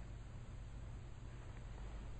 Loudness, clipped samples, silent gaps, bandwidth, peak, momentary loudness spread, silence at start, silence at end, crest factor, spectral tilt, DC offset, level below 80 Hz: -54 LUFS; under 0.1%; none; 8.4 kHz; -40 dBFS; 2 LU; 0 s; 0 s; 10 dB; -6.5 dB/octave; under 0.1%; -52 dBFS